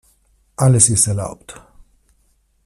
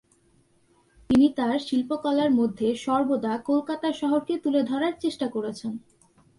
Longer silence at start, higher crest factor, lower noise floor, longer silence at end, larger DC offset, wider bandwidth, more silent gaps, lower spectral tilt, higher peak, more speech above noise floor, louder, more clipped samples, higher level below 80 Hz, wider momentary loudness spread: second, 0.6 s vs 1.1 s; about the same, 20 dB vs 16 dB; about the same, -60 dBFS vs -63 dBFS; first, 1.15 s vs 0.6 s; neither; first, 14 kHz vs 11.5 kHz; neither; second, -4.5 dB/octave vs -6 dB/octave; first, 0 dBFS vs -10 dBFS; first, 45 dB vs 39 dB; first, -14 LUFS vs -25 LUFS; neither; first, -46 dBFS vs -58 dBFS; first, 24 LU vs 8 LU